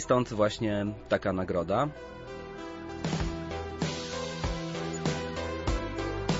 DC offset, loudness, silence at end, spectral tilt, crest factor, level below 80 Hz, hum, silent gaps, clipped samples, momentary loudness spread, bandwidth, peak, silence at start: under 0.1%; -32 LUFS; 0 s; -5.5 dB/octave; 18 dB; -44 dBFS; none; none; under 0.1%; 12 LU; 8 kHz; -12 dBFS; 0 s